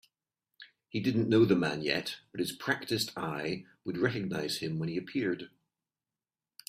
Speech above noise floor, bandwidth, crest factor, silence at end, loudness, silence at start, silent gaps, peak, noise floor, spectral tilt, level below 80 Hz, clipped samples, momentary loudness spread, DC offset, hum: over 59 dB; 15.5 kHz; 20 dB; 1.2 s; -32 LUFS; 0.6 s; none; -12 dBFS; under -90 dBFS; -5.5 dB/octave; -68 dBFS; under 0.1%; 13 LU; under 0.1%; none